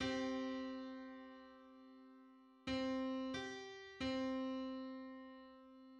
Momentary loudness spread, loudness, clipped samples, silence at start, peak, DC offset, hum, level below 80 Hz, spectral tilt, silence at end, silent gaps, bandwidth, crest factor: 20 LU; -45 LUFS; under 0.1%; 0 s; -30 dBFS; under 0.1%; none; -70 dBFS; -5 dB/octave; 0 s; none; 8.8 kHz; 16 dB